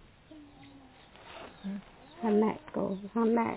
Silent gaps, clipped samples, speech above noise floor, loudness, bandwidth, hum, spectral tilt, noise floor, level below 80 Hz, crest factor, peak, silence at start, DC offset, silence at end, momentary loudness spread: none; under 0.1%; 25 dB; -32 LUFS; 4 kHz; none; -6.5 dB/octave; -55 dBFS; -64 dBFS; 18 dB; -16 dBFS; 0.3 s; under 0.1%; 0 s; 25 LU